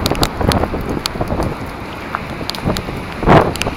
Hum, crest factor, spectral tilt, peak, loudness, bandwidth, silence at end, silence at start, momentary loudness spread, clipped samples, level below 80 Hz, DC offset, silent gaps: none; 18 dB; -5.5 dB/octave; 0 dBFS; -18 LUFS; 17 kHz; 0 s; 0 s; 13 LU; 0.1%; -28 dBFS; under 0.1%; none